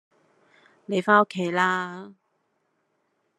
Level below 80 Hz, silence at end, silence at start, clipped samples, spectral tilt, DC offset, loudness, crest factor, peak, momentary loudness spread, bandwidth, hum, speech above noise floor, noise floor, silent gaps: -78 dBFS; 1.25 s; 0.9 s; under 0.1%; -5.5 dB/octave; under 0.1%; -23 LUFS; 24 dB; -4 dBFS; 14 LU; 12 kHz; none; 50 dB; -73 dBFS; none